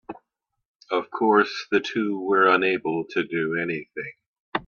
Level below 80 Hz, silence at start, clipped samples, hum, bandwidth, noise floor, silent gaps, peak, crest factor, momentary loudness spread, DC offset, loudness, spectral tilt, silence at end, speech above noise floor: -68 dBFS; 0.1 s; under 0.1%; none; 7 kHz; -77 dBFS; 0.68-0.74 s, 4.27-4.34 s, 4.40-4.52 s; -6 dBFS; 18 dB; 17 LU; under 0.1%; -23 LUFS; -5.5 dB/octave; 0.05 s; 54 dB